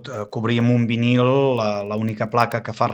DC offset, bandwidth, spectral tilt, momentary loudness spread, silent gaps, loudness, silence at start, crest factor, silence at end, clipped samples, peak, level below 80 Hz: under 0.1%; 10 kHz; -7.5 dB/octave; 7 LU; none; -20 LUFS; 0 s; 18 dB; 0 s; under 0.1%; -2 dBFS; -60 dBFS